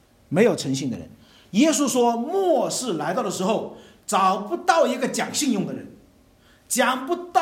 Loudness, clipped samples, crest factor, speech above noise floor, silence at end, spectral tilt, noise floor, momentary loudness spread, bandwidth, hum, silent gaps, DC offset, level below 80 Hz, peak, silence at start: -22 LUFS; under 0.1%; 20 dB; 34 dB; 0 s; -4 dB/octave; -55 dBFS; 8 LU; 16.5 kHz; none; none; under 0.1%; -64 dBFS; -4 dBFS; 0.3 s